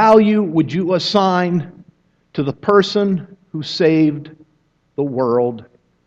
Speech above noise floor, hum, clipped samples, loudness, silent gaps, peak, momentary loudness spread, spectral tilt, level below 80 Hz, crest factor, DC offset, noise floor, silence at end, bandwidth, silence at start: 45 dB; none; under 0.1%; -16 LUFS; none; 0 dBFS; 15 LU; -7 dB/octave; -58 dBFS; 16 dB; under 0.1%; -61 dBFS; 0.45 s; 8 kHz; 0 s